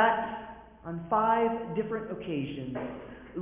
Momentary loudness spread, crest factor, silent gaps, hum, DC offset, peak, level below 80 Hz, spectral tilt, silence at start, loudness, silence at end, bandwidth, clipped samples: 16 LU; 20 dB; none; none; under 0.1%; -10 dBFS; -58 dBFS; -4.5 dB/octave; 0 s; -31 LUFS; 0 s; 3.8 kHz; under 0.1%